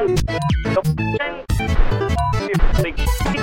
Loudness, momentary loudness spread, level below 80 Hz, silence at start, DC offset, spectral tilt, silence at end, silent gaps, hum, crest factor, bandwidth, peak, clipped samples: -20 LUFS; 3 LU; -22 dBFS; 0 s; under 0.1%; -6 dB/octave; 0 s; none; none; 14 dB; 16.5 kHz; -4 dBFS; under 0.1%